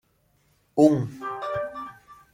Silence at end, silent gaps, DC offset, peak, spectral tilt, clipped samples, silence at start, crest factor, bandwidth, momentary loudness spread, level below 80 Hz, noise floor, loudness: 0.2 s; none; under 0.1%; -4 dBFS; -7.5 dB/octave; under 0.1%; 0.75 s; 22 dB; 10 kHz; 17 LU; -62 dBFS; -66 dBFS; -25 LUFS